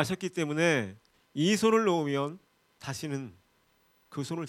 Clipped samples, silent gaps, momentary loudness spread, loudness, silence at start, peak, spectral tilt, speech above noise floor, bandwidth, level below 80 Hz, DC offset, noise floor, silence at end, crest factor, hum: under 0.1%; none; 17 LU; -29 LUFS; 0 s; -10 dBFS; -5 dB/octave; 39 dB; 16 kHz; -70 dBFS; under 0.1%; -68 dBFS; 0 s; 22 dB; none